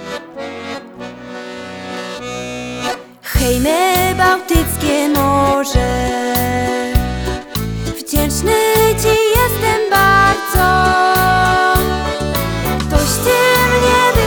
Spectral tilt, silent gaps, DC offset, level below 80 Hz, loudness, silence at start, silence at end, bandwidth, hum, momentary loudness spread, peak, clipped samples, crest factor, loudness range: -4 dB/octave; none; under 0.1%; -24 dBFS; -14 LUFS; 0 s; 0 s; over 20 kHz; none; 15 LU; 0 dBFS; under 0.1%; 14 dB; 6 LU